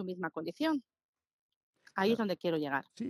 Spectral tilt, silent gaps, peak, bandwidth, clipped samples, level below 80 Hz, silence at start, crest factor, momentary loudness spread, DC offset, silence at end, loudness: -6.5 dB/octave; 1.04-1.13 s, 1.33-1.50 s, 1.56-1.73 s; -18 dBFS; 15.5 kHz; under 0.1%; -80 dBFS; 0 s; 18 dB; 8 LU; under 0.1%; 0 s; -34 LUFS